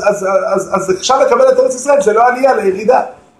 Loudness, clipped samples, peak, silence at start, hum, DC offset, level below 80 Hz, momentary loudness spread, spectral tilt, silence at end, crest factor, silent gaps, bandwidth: -11 LUFS; under 0.1%; 0 dBFS; 0 s; none; under 0.1%; -52 dBFS; 6 LU; -3.5 dB/octave; 0.25 s; 12 dB; none; 12.5 kHz